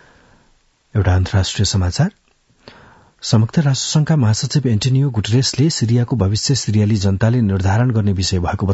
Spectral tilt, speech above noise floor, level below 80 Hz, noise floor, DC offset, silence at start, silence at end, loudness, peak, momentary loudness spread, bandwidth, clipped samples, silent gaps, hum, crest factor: -5.5 dB/octave; 41 dB; -42 dBFS; -57 dBFS; under 0.1%; 0.95 s; 0 s; -16 LUFS; -2 dBFS; 3 LU; 8 kHz; under 0.1%; none; none; 16 dB